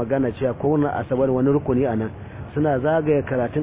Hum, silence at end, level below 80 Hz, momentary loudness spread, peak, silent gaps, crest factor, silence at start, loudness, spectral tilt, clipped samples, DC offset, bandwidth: none; 0 s; -44 dBFS; 7 LU; -8 dBFS; none; 12 dB; 0 s; -21 LUFS; -12.5 dB/octave; under 0.1%; under 0.1%; 3.8 kHz